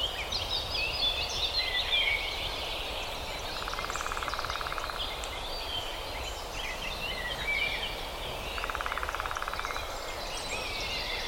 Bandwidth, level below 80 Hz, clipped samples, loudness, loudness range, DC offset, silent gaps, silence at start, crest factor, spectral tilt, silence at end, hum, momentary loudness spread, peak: 17 kHz; -44 dBFS; under 0.1%; -32 LUFS; 5 LU; under 0.1%; none; 0 s; 18 dB; -2 dB/octave; 0 s; none; 8 LU; -16 dBFS